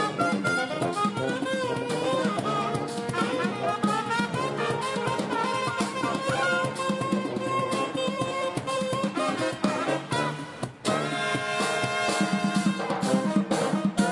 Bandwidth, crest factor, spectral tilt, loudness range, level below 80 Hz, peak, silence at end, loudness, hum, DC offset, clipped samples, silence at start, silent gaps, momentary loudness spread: 11.5 kHz; 18 dB; -5 dB/octave; 2 LU; -64 dBFS; -10 dBFS; 0 s; -27 LUFS; none; under 0.1%; under 0.1%; 0 s; none; 3 LU